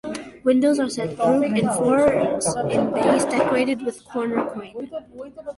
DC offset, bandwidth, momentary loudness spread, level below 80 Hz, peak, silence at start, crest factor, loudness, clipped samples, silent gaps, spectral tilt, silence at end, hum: under 0.1%; 11.5 kHz; 15 LU; -54 dBFS; -6 dBFS; 0.05 s; 16 dB; -21 LUFS; under 0.1%; none; -5 dB/octave; 0.05 s; none